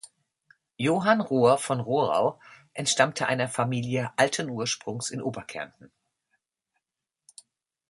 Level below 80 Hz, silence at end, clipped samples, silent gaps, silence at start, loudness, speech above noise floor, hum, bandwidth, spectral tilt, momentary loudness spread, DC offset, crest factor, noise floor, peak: -68 dBFS; 2.25 s; under 0.1%; none; 0.8 s; -26 LUFS; 61 dB; none; 11.5 kHz; -4 dB/octave; 12 LU; under 0.1%; 24 dB; -87 dBFS; -4 dBFS